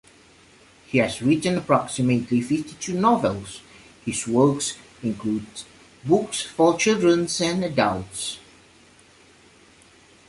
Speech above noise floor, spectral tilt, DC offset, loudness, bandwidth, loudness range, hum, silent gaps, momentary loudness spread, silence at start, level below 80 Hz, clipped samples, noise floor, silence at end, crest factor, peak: 31 dB; -5 dB/octave; under 0.1%; -22 LUFS; 11.5 kHz; 3 LU; none; none; 13 LU; 0.9 s; -56 dBFS; under 0.1%; -53 dBFS; 1.9 s; 20 dB; -4 dBFS